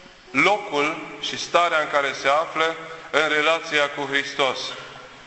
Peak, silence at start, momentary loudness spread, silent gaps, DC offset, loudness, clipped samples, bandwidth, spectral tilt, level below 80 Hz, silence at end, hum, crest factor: -2 dBFS; 0 s; 10 LU; none; under 0.1%; -22 LUFS; under 0.1%; 8.4 kHz; -2.5 dB/octave; -62 dBFS; 0 s; none; 20 dB